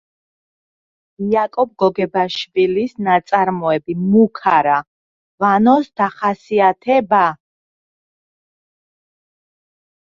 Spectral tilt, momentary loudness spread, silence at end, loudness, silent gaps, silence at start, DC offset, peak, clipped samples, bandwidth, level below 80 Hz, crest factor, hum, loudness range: -7 dB/octave; 6 LU; 2.8 s; -16 LUFS; 4.87-5.38 s; 1.2 s; under 0.1%; -2 dBFS; under 0.1%; 7.4 kHz; -62 dBFS; 16 dB; none; 4 LU